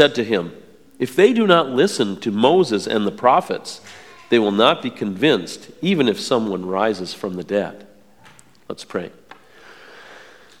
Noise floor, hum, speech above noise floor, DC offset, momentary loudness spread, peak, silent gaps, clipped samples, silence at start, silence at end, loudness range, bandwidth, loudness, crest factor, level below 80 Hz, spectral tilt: -49 dBFS; none; 31 dB; 0.3%; 16 LU; 0 dBFS; none; under 0.1%; 0 s; 0.45 s; 11 LU; 15.5 kHz; -19 LUFS; 20 dB; -66 dBFS; -5 dB/octave